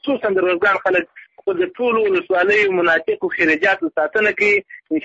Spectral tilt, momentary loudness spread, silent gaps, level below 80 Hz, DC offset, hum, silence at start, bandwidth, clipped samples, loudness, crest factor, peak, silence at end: -5 dB/octave; 7 LU; none; -58 dBFS; under 0.1%; none; 0 s; 8 kHz; under 0.1%; -17 LUFS; 12 dB; -6 dBFS; 0 s